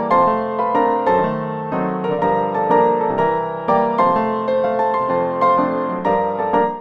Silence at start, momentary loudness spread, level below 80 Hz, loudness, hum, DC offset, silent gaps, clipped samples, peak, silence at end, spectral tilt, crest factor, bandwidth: 0 s; 5 LU; -52 dBFS; -18 LUFS; none; under 0.1%; none; under 0.1%; -4 dBFS; 0 s; -8.5 dB/octave; 14 dB; 6.8 kHz